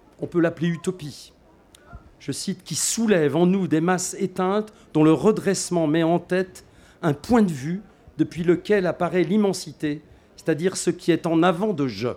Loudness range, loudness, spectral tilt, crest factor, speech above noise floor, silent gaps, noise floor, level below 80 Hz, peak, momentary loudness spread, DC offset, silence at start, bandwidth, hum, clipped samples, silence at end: 3 LU; -22 LUFS; -5.5 dB/octave; 16 dB; 31 dB; none; -53 dBFS; -56 dBFS; -6 dBFS; 11 LU; under 0.1%; 0.2 s; 16.5 kHz; none; under 0.1%; 0 s